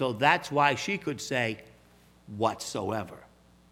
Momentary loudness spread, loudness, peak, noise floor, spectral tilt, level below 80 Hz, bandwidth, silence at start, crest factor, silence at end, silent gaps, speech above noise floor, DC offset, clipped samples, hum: 14 LU; -28 LUFS; -6 dBFS; -59 dBFS; -4 dB/octave; -64 dBFS; 16.5 kHz; 0 s; 24 dB; 0.5 s; none; 30 dB; under 0.1%; under 0.1%; 60 Hz at -55 dBFS